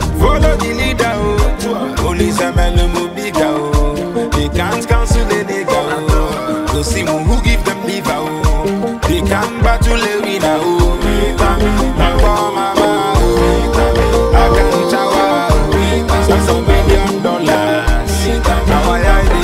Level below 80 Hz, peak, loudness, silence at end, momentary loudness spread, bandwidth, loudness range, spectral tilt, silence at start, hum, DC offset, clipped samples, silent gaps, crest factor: -16 dBFS; 0 dBFS; -14 LUFS; 0 s; 5 LU; 16 kHz; 3 LU; -5.5 dB/octave; 0 s; none; under 0.1%; under 0.1%; none; 12 dB